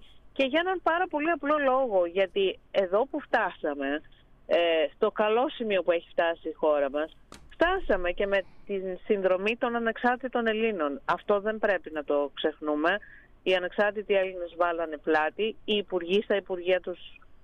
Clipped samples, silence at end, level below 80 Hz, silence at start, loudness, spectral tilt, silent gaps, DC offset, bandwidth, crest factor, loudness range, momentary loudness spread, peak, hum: under 0.1%; 0.05 s; -50 dBFS; 0 s; -28 LUFS; -6 dB/octave; none; under 0.1%; 8.4 kHz; 14 dB; 2 LU; 6 LU; -12 dBFS; none